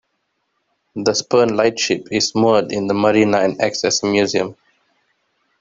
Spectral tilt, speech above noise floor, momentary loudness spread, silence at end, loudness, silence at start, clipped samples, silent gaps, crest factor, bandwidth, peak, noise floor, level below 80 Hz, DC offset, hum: -4 dB/octave; 54 dB; 6 LU; 1.05 s; -17 LUFS; 0.95 s; under 0.1%; none; 16 dB; 7.8 kHz; -2 dBFS; -70 dBFS; -58 dBFS; under 0.1%; none